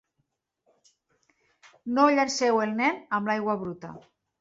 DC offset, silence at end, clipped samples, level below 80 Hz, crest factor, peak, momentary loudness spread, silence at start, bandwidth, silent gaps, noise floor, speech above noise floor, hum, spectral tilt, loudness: under 0.1%; 0.4 s; under 0.1%; -70 dBFS; 20 dB; -10 dBFS; 19 LU; 1.85 s; 8 kHz; none; -78 dBFS; 52 dB; none; -4 dB/octave; -25 LUFS